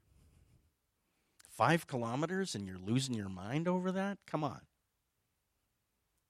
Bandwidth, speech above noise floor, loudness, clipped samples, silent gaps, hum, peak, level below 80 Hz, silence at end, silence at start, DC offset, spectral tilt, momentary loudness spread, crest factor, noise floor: 15.5 kHz; 47 dB; -36 LUFS; under 0.1%; none; none; -16 dBFS; -76 dBFS; 1.7 s; 1.5 s; under 0.1%; -5.5 dB/octave; 10 LU; 24 dB; -83 dBFS